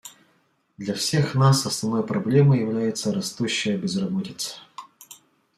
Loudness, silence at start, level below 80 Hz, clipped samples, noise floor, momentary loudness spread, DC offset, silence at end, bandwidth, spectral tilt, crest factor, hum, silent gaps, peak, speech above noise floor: -23 LUFS; 0.05 s; -62 dBFS; under 0.1%; -66 dBFS; 19 LU; under 0.1%; 0.45 s; 14.5 kHz; -5.5 dB/octave; 18 dB; none; none; -6 dBFS; 43 dB